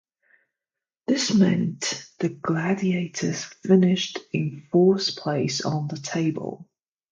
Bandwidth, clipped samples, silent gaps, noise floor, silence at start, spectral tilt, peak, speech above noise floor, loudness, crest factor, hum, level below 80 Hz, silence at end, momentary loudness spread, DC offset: 9 kHz; under 0.1%; none; -89 dBFS; 1.1 s; -5.5 dB/octave; -6 dBFS; 66 dB; -24 LUFS; 18 dB; none; -66 dBFS; 0.5 s; 10 LU; under 0.1%